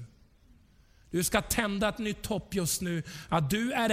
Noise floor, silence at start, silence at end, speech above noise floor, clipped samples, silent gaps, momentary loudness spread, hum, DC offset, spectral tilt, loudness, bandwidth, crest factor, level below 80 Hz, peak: -60 dBFS; 0 s; 0 s; 31 dB; under 0.1%; none; 7 LU; none; under 0.1%; -4 dB/octave; -30 LUFS; 16.5 kHz; 20 dB; -50 dBFS; -10 dBFS